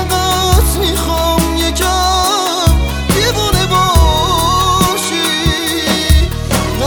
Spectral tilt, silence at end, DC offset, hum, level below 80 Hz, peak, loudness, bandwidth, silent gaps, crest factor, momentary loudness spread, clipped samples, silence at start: -4 dB/octave; 0 s; under 0.1%; none; -18 dBFS; 0 dBFS; -12 LUFS; over 20 kHz; none; 12 dB; 3 LU; under 0.1%; 0 s